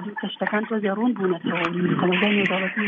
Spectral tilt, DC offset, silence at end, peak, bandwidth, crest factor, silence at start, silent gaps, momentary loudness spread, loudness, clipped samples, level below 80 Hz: -7.5 dB/octave; under 0.1%; 0 s; -6 dBFS; 7 kHz; 16 dB; 0 s; none; 6 LU; -23 LUFS; under 0.1%; -68 dBFS